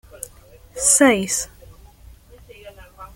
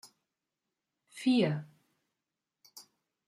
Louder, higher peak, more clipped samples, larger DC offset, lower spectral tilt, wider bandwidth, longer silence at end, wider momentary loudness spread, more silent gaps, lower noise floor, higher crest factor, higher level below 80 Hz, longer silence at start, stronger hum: first, -16 LUFS vs -31 LUFS; first, -2 dBFS vs -16 dBFS; neither; neither; second, -2 dB/octave vs -6.5 dB/octave; first, 17 kHz vs 14.5 kHz; second, 0.1 s vs 0.45 s; about the same, 23 LU vs 25 LU; neither; second, -47 dBFS vs -89 dBFS; about the same, 20 dB vs 20 dB; first, -48 dBFS vs -82 dBFS; second, 0.15 s vs 1.15 s; neither